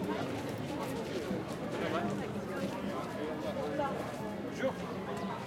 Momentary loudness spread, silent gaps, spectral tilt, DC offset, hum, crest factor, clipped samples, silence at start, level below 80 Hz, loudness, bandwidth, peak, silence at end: 3 LU; none; -6 dB/octave; under 0.1%; none; 16 dB; under 0.1%; 0 s; -64 dBFS; -37 LUFS; 16.5 kHz; -20 dBFS; 0 s